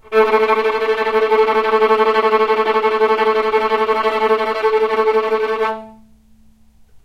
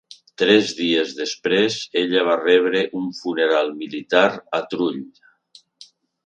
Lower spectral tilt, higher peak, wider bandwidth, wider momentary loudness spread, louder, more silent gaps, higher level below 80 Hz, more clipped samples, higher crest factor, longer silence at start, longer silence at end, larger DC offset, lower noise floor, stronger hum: about the same, -4 dB/octave vs -4 dB/octave; about the same, -2 dBFS vs 0 dBFS; second, 7.8 kHz vs 9.2 kHz; second, 4 LU vs 9 LU; first, -15 LUFS vs -20 LUFS; neither; first, -52 dBFS vs -70 dBFS; neither; second, 14 dB vs 20 dB; second, 0.1 s vs 0.4 s; first, 1.1 s vs 0.4 s; neither; second, -48 dBFS vs -53 dBFS; neither